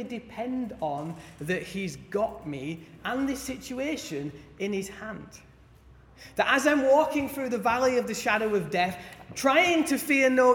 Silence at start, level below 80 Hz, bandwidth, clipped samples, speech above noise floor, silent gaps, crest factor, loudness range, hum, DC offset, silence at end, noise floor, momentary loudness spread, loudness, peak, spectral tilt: 0 s; -58 dBFS; 18 kHz; under 0.1%; 27 dB; none; 20 dB; 9 LU; none; under 0.1%; 0 s; -54 dBFS; 16 LU; -27 LUFS; -8 dBFS; -4 dB/octave